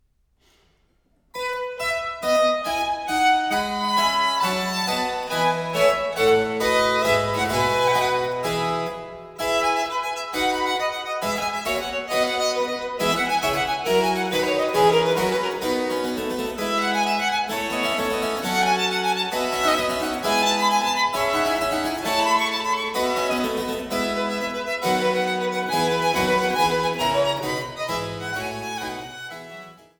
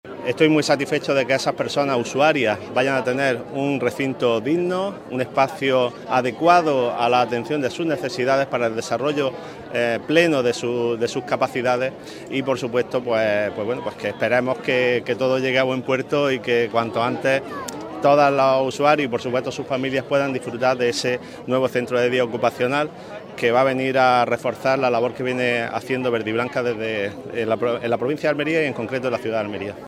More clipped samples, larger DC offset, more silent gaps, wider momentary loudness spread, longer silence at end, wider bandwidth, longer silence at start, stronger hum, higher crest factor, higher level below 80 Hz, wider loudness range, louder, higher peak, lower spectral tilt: neither; neither; neither; about the same, 8 LU vs 7 LU; first, 0.25 s vs 0 s; first, over 20 kHz vs 15.5 kHz; first, 1.35 s vs 0.05 s; neither; about the same, 18 dB vs 20 dB; first, -52 dBFS vs -62 dBFS; about the same, 3 LU vs 3 LU; about the same, -22 LUFS vs -21 LUFS; second, -6 dBFS vs 0 dBFS; second, -3 dB/octave vs -5 dB/octave